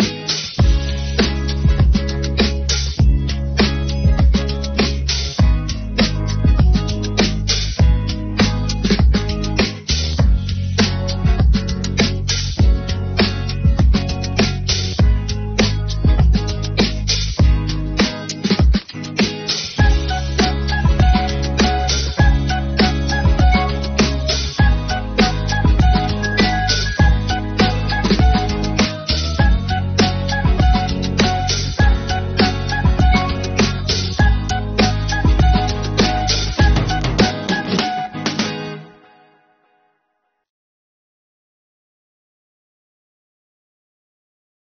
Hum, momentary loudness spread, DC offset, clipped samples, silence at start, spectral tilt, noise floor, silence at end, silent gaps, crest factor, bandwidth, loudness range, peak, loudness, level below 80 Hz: none; 5 LU; under 0.1%; under 0.1%; 0 s; -4.5 dB/octave; -70 dBFS; 5.75 s; none; 16 dB; 6.8 kHz; 1 LU; 0 dBFS; -17 LUFS; -20 dBFS